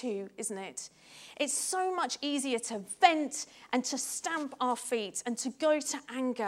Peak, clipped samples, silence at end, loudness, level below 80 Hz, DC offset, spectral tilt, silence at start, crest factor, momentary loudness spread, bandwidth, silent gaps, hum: -6 dBFS; under 0.1%; 0 s; -32 LUFS; -82 dBFS; under 0.1%; -1.5 dB/octave; 0 s; 26 dB; 13 LU; 16.5 kHz; none; none